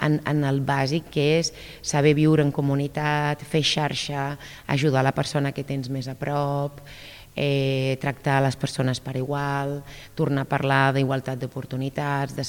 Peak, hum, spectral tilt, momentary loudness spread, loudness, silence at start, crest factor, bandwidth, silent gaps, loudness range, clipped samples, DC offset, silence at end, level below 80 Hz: -6 dBFS; none; -5.5 dB/octave; 11 LU; -24 LUFS; 0 s; 18 dB; 16.5 kHz; none; 4 LU; under 0.1%; under 0.1%; 0 s; -52 dBFS